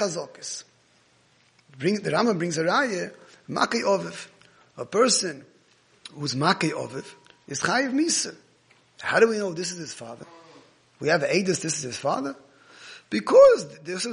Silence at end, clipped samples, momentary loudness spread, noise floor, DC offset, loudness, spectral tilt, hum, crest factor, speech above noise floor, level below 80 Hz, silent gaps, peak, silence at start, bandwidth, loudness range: 0 s; under 0.1%; 18 LU; -61 dBFS; under 0.1%; -24 LUFS; -3.5 dB/octave; none; 22 dB; 38 dB; -68 dBFS; none; -4 dBFS; 0 s; 10.5 kHz; 5 LU